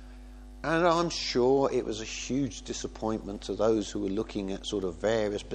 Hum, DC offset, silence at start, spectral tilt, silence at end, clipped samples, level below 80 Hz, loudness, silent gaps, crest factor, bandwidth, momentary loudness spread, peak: none; under 0.1%; 0 s; -4.5 dB/octave; 0 s; under 0.1%; -48 dBFS; -30 LUFS; none; 20 dB; 9.8 kHz; 11 LU; -10 dBFS